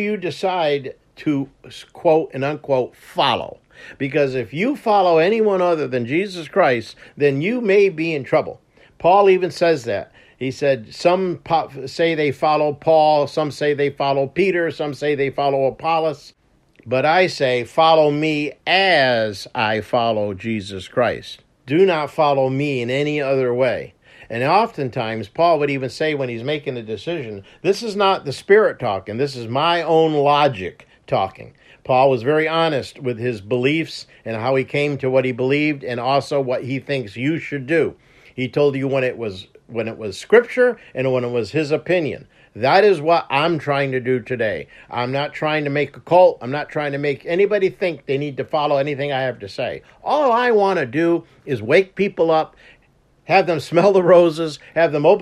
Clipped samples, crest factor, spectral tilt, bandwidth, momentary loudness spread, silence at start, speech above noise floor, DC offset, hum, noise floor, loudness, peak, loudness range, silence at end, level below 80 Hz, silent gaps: under 0.1%; 18 dB; -6 dB/octave; 12.5 kHz; 12 LU; 0 s; 38 dB; under 0.1%; none; -57 dBFS; -19 LUFS; 0 dBFS; 4 LU; 0 s; -60 dBFS; none